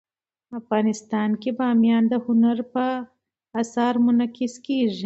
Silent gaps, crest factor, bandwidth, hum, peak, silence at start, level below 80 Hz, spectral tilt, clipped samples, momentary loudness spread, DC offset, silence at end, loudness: none; 14 dB; 8 kHz; none; -8 dBFS; 0.5 s; -70 dBFS; -6 dB/octave; under 0.1%; 12 LU; under 0.1%; 0 s; -22 LUFS